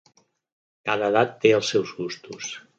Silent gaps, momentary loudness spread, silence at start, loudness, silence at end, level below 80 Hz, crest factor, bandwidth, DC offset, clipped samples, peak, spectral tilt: none; 14 LU; 0.85 s; -23 LUFS; 0.2 s; -70 dBFS; 20 dB; 8 kHz; under 0.1%; under 0.1%; -4 dBFS; -4 dB/octave